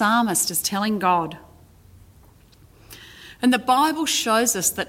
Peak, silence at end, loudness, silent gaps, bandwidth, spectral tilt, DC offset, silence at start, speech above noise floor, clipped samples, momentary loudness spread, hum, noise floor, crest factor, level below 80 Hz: -6 dBFS; 0.05 s; -20 LUFS; none; 17 kHz; -2.5 dB/octave; under 0.1%; 0 s; 31 dB; under 0.1%; 22 LU; none; -51 dBFS; 18 dB; -56 dBFS